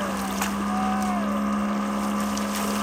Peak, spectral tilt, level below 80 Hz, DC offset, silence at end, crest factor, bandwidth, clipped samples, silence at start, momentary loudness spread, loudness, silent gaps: -12 dBFS; -4.5 dB/octave; -48 dBFS; under 0.1%; 0 s; 14 dB; 16.5 kHz; under 0.1%; 0 s; 2 LU; -26 LUFS; none